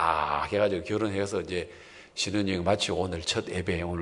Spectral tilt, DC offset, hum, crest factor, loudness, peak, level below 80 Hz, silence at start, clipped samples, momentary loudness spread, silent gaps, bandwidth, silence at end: -4.5 dB/octave; under 0.1%; none; 20 dB; -29 LUFS; -10 dBFS; -56 dBFS; 0 s; under 0.1%; 8 LU; none; 11 kHz; 0 s